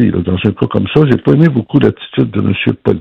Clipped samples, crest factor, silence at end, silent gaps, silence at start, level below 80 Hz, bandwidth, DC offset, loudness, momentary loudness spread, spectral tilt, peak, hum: 1%; 12 dB; 0 s; none; 0 s; -40 dBFS; 5.6 kHz; under 0.1%; -12 LUFS; 5 LU; -9.5 dB/octave; 0 dBFS; none